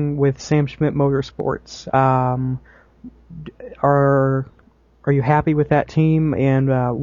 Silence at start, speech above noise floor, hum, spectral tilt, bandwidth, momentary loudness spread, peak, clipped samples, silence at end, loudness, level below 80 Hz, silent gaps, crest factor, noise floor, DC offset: 0 s; 33 dB; none; -8.5 dB/octave; 7.4 kHz; 15 LU; -2 dBFS; under 0.1%; 0 s; -18 LUFS; -44 dBFS; none; 16 dB; -51 dBFS; under 0.1%